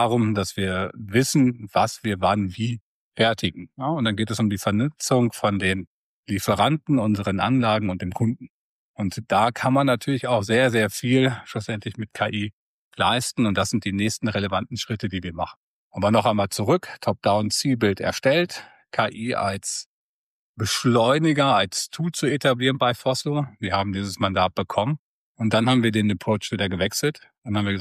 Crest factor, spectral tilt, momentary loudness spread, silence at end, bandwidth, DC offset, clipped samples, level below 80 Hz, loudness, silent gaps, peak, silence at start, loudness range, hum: 16 dB; -5 dB/octave; 10 LU; 0 s; 15 kHz; under 0.1%; under 0.1%; -58 dBFS; -23 LUFS; 2.81-3.11 s, 5.87-6.24 s, 8.50-8.94 s, 12.53-12.91 s, 15.57-15.91 s, 19.86-20.54 s, 24.99-25.35 s, 27.38-27.42 s; -8 dBFS; 0 s; 3 LU; none